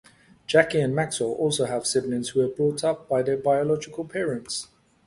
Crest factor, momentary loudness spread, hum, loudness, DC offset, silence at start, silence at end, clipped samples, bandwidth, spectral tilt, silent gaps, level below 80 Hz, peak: 22 dB; 10 LU; none; -25 LUFS; under 0.1%; 0.5 s; 0.45 s; under 0.1%; 11.5 kHz; -4.5 dB/octave; none; -62 dBFS; -2 dBFS